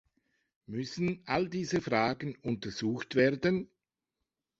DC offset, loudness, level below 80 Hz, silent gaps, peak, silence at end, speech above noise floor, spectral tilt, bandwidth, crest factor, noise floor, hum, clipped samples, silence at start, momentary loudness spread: under 0.1%; -32 LUFS; -64 dBFS; none; -12 dBFS; 0.95 s; 56 dB; -6 dB/octave; 8 kHz; 22 dB; -88 dBFS; none; under 0.1%; 0.7 s; 10 LU